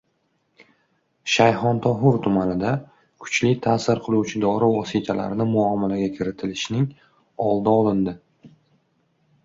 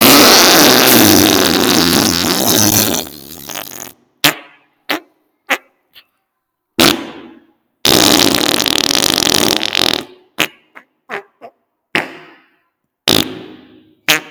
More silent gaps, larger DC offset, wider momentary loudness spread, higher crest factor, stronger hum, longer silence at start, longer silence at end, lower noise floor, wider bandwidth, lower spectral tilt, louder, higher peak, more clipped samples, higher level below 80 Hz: neither; neither; second, 9 LU vs 22 LU; first, 20 dB vs 14 dB; neither; first, 1.25 s vs 0 s; first, 0.95 s vs 0 s; about the same, -69 dBFS vs -72 dBFS; second, 7.8 kHz vs over 20 kHz; first, -6 dB/octave vs -2 dB/octave; second, -21 LUFS vs -10 LUFS; about the same, -2 dBFS vs 0 dBFS; second, under 0.1% vs 0.4%; second, -54 dBFS vs -46 dBFS